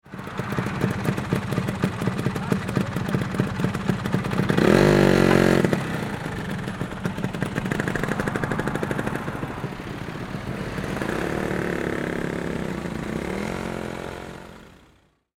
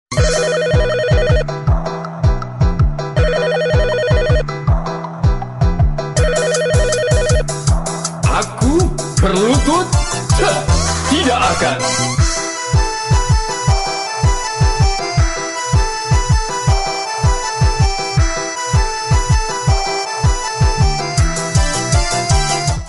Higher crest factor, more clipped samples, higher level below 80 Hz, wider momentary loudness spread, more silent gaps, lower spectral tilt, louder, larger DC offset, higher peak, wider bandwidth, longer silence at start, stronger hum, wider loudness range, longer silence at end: first, 22 dB vs 12 dB; neither; second, -42 dBFS vs -20 dBFS; first, 14 LU vs 4 LU; neither; first, -6.5 dB/octave vs -4.5 dB/octave; second, -25 LUFS vs -16 LUFS; neither; about the same, -2 dBFS vs -4 dBFS; first, 17 kHz vs 11.5 kHz; about the same, 0.05 s vs 0.1 s; neither; first, 8 LU vs 2 LU; first, 0.65 s vs 0 s